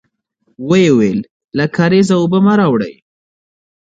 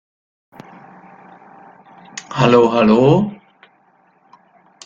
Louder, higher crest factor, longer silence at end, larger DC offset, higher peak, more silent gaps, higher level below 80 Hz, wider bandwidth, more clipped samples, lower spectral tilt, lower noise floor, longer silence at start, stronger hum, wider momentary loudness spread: about the same, -13 LUFS vs -14 LUFS; about the same, 14 dB vs 18 dB; second, 1.05 s vs 1.5 s; neither; about the same, 0 dBFS vs 0 dBFS; first, 1.30-1.48 s vs none; about the same, -52 dBFS vs -54 dBFS; first, 9 kHz vs 7.6 kHz; neither; about the same, -7 dB/octave vs -7 dB/octave; first, -62 dBFS vs -56 dBFS; second, 0.6 s vs 2.15 s; neither; second, 12 LU vs 20 LU